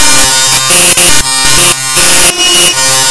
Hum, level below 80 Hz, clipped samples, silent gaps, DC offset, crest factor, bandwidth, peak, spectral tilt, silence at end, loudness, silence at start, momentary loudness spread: none; -28 dBFS; 7%; none; under 0.1%; 6 dB; 11 kHz; 0 dBFS; 0 dB/octave; 0 s; -3 LUFS; 0 s; 3 LU